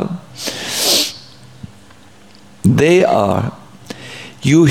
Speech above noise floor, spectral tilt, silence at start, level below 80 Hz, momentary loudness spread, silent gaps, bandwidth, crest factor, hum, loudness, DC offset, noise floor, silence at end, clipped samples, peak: 33 dB; -4.5 dB/octave; 0 s; -48 dBFS; 20 LU; none; 17 kHz; 16 dB; none; -15 LUFS; 0.5%; -44 dBFS; 0 s; under 0.1%; 0 dBFS